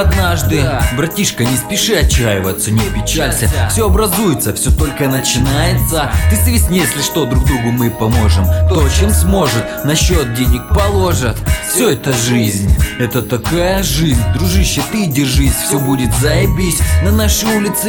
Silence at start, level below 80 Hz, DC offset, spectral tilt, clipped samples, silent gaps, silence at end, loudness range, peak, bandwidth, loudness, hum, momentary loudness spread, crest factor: 0 s; -20 dBFS; under 0.1%; -4.5 dB/octave; under 0.1%; none; 0 s; 1 LU; 0 dBFS; 17.5 kHz; -13 LUFS; none; 3 LU; 12 dB